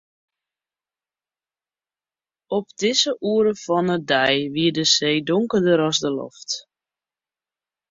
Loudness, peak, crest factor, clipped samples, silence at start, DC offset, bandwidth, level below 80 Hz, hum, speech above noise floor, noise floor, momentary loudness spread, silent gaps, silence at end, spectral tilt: -20 LUFS; -4 dBFS; 20 dB; under 0.1%; 2.5 s; under 0.1%; 7.8 kHz; -64 dBFS; none; over 70 dB; under -90 dBFS; 11 LU; none; 1.3 s; -3.5 dB/octave